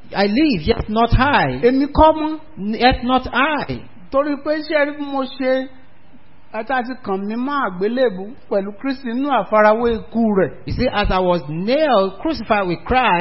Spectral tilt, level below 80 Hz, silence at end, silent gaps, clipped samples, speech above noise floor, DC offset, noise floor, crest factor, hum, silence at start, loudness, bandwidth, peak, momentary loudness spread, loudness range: -10 dB/octave; -32 dBFS; 0 s; none; under 0.1%; 32 dB; 2%; -50 dBFS; 18 dB; none; 0.1 s; -18 LUFS; 5.8 kHz; 0 dBFS; 10 LU; 6 LU